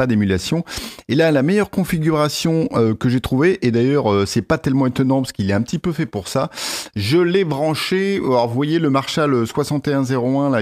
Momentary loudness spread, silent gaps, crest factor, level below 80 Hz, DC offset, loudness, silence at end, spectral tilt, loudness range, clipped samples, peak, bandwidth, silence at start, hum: 6 LU; none; 14 dB; -46 dBFS; under 0.1%; -18 LUFS; 0 s; -6 dB/octave; 2 LU; under 0.1%; -4 dBFS; 16 kHz; 0 s; none